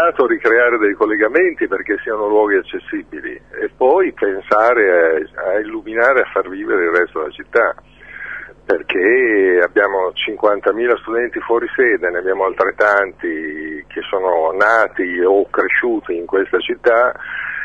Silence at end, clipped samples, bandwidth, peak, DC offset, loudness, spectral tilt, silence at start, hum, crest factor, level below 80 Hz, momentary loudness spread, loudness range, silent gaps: 0 s; under 0.1%; 7.2 kHz; -2 dBFS; 0.2%; -16 LUFS; -5.5 dB/octave; 0 s; none; 14 dB; -52 dBFS; 12 LU; 2 LU; none